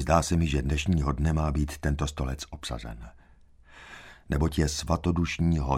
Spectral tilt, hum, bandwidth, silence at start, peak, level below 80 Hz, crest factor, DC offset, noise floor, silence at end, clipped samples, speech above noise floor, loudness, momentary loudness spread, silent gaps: -6 dB/octave; none; 15 kHz; 0 s; -8 dBFS; -34 dBFS; 20 dB; under 0.1%; -55 dBFS; 0 s; under 0.1%; 29 dB; -28 LUFS; 17 LU; none